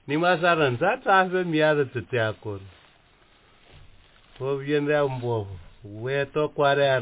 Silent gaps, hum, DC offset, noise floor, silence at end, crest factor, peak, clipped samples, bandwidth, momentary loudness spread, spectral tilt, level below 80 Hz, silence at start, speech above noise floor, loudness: none; none; under 0.1%; -58 dBFS; 0 s; 18 dB; -6 dBFS; under 0.1%; 4 kHz; 15 LU; -10 dB/octave; -56 dBFS; 0.05 s; 34 dB; -24 LUFS